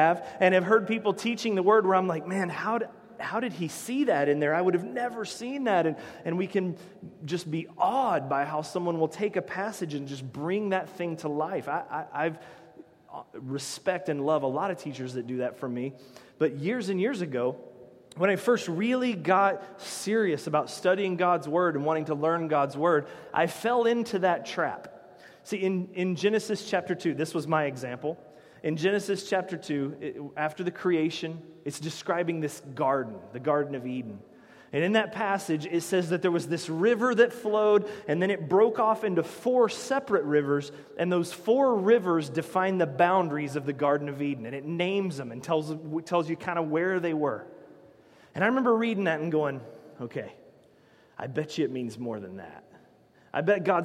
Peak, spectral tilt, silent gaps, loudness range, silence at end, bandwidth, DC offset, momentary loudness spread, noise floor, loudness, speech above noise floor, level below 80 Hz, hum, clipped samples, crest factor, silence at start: -8 dBFS; -5.5 dB/octave; none; 6 LU; 0 s; 15.5 kHz; under 0.1%; 12 LU; -59 dBFS; -28 LUFS; 32 dB; -76 dBFS; none; under 0.1%; 20 dB; 0 s